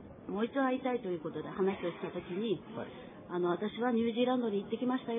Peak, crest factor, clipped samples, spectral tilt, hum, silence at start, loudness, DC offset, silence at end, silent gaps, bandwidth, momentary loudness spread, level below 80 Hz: -20 dBFS; 16 dB; under 0.1%; -5 dB/octave; none; 0 s; -35 LUFS; under 0.1%; 0 s; none; 3.9 kHz; 10 LU; -70 dBFS